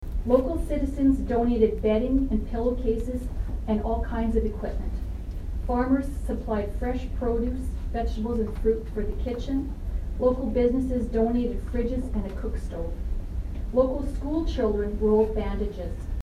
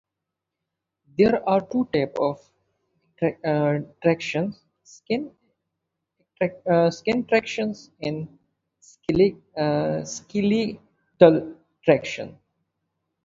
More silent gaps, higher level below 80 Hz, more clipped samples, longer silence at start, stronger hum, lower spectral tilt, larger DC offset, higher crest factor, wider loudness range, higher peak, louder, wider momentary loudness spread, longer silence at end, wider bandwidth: neither; first, -30 dBFS vs -58 dBFS; neither; second, 0 s vs 1.2 s; neither; first, -8.5 dB/octave vs -6.5 dB/octave; neither; second, 18 dB vs 24 dB; about the same, 4 LU vs 4 LU; second, -8 dBFS vs 0 dBFS; second, -27 LUFS vs -23 LUFS; second, 10 LU vs 14 LU; second, 0 s vs 0.95 s; first, 13 kHz vs 7.8 kHz